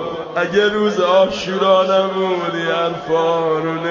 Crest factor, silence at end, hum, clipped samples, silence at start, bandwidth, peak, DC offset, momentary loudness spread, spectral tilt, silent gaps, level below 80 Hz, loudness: 14 dB; 0 s; none; under 0.1%; 0 s; 7.4 kHz; -2 dBFS; under 0.1%; 6 LU; -5 dB/octave; none; -54 dBFS; -17 LUFS